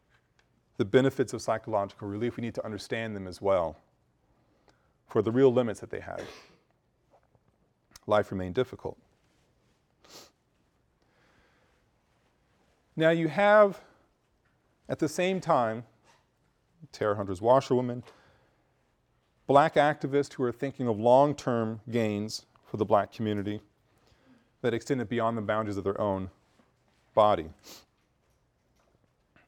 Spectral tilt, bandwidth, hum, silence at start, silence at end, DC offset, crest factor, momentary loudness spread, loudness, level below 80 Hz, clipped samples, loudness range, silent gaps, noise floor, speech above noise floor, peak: -6.5 dB/octave; 16.5 kHz; none; 0.8 s; 1.7 s; under 0.1%; 24 dB; 17 LU; -28 LUFS; -66 dBFS; under 0.1%; 8 LU; none; -71 dBFS; 44 dB; -6 dBFS